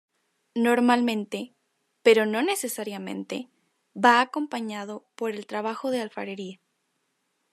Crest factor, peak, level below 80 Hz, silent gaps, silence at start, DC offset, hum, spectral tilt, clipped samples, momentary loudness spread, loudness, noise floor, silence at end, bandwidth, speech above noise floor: 22 dB; -4 dBFS; -86 dBFS; none; 0.55 s; under 0.1%; none; -4 dB/octave; under 0.1%; 16 LU; -25 LUFS; -75 dBFS; 1 s; 13.5 kHz; 50 dB